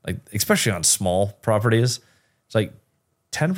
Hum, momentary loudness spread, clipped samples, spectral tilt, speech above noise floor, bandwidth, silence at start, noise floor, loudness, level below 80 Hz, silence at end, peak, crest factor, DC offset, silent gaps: none; 12 LU; under 0.1%; -4 dB/octave; 48 dB; 17 kHz; 0.05 s; -70 dBFS; -21 LUFS; -54 dBFS; 0 s; -6 dBFS; 16 dB; under 0.1%; none